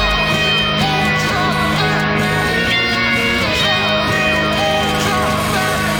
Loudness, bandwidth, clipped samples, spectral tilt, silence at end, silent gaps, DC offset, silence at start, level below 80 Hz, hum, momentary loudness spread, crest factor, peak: -14 LUFS; 19.5 kHz; under 0.1%; -4 dB/octave; 0 s; none; under 0.1%; 0 s; -32 dBFS; none; 2 LU; 12 dB; -4 dBFS